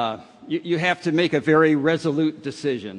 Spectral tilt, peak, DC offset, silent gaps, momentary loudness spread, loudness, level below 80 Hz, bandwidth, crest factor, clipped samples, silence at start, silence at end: -6.5 dB/octave; -6 dBFS; under 0.1%; none; 11 LU; -21 LUFS; -66 dBFS; 10 kHz; 16 dB; under 0.1%; 0 s; 0 s